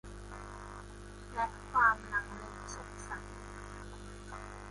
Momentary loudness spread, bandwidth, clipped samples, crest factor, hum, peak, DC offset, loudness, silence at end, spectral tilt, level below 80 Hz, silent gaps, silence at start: 20 LU; 11.5 kHz; under 0.1%; 24 dB; 50 Hz at -50 dBFS; -14 dBFS; under 0.1%; -36 LUFS; 0 s; -4 dB/octave; -52 dBFS; none; 0.05 s